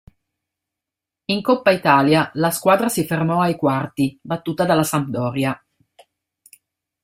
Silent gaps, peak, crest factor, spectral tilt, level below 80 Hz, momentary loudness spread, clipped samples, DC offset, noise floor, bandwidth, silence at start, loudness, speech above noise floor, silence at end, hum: none; -2 dBFS; 20 dB; -5.5 dB/octave; -58 dBFS; 10 LU; under 0.1%; under 0.1%; -86 dBFS; 16 kHz; 1.3 s; -19 LUFS; 68 dB; 1.45 s; none